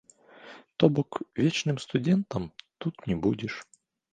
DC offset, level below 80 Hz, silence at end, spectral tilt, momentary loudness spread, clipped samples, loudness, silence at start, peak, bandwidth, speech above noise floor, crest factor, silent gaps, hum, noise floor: under 0.1%; -58 dBFS; 0.5 s; -6.5 dB/octave; 17 LU; under 0.1%; -28 LUFS; 0.45 s; -4 dBFS; 9.6 kHz; 24 dB; 24 dB; none; none; -51 dBFS